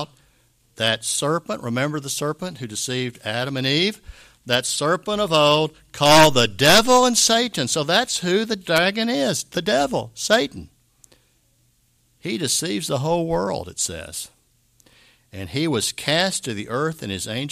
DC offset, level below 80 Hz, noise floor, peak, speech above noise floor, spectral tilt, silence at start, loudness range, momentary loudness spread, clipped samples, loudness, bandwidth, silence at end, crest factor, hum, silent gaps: under 0.1%; -52 dBFS; -62 dBFS; 0 dBFS; 42 dB; -3 dB/octave; 0 s; 9 LU; 14 LU; under 0.1%; -20 LUFS; 15.5 kHz; 0 s; 20 dB; none; none